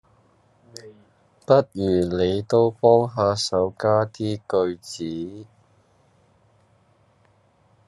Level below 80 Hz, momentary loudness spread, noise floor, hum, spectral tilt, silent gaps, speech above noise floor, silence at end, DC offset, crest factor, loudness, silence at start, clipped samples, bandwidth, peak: -64 dBFS; 22 LU; -60 dBFS; none; -6 dB/octave; none; 39 dB; 2.45 s; under 0.1%; 20 dB; -21 LUFS; 0.85 s; under 0.1%; 12 kHz; -4 dBFS